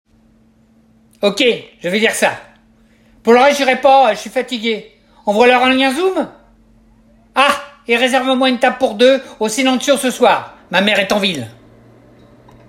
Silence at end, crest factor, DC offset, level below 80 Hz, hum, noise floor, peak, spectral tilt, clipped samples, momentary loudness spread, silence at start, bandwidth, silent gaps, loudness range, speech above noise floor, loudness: 1.15 s; 16 dB; under 0.1%; -54 dBFS; none; -51 dBFS; 0 dBFS; -3 dB/octave; under 0.1%; 11 LU; 1.2 s; 16.5 kHz; none; 3 LU; 38 dB; -14 LUFS